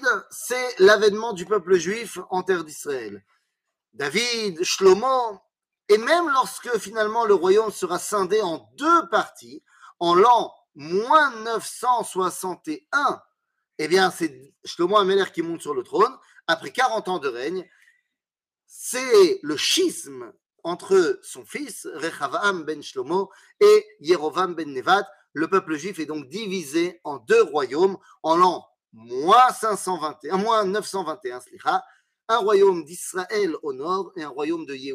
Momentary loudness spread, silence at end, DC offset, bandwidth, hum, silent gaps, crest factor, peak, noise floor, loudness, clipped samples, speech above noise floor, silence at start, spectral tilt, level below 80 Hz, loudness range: 14 LU; 0 s; under 0.1%; 15.5 kHz; none; none; 18 dB; -4 dBFS; under -90 dBFS; -22 LUFS; under 0.1%; over 68 dB; 0 s; -3.5 dB/octave; -72 dBFS; 4 LU